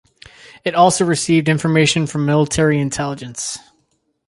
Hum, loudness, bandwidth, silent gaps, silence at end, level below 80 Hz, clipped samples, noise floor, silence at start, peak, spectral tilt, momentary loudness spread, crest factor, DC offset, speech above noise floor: none; -16 LUFS; 11.5 kHz; none; 0.7 s; -46 dBFS; under 0.1%; -65 dBFS; 0.65 s; -2 dBFS; -5 dB/octave; 11 LU; 16 dB; under 0.1%; 49 dB